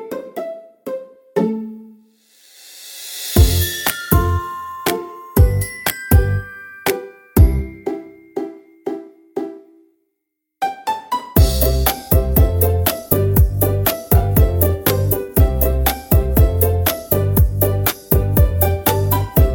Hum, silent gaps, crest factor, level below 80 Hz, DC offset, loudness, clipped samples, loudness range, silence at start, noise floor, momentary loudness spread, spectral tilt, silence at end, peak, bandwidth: none; none; 16 dB; -22 dBFS; under 0.1%; -17 LUFS; under 0.1%; 7 LU; 0 s; -76 dBFS; 15 LU; -5.5 dB/octave; 0 s; 0 dBFS; 17 kHz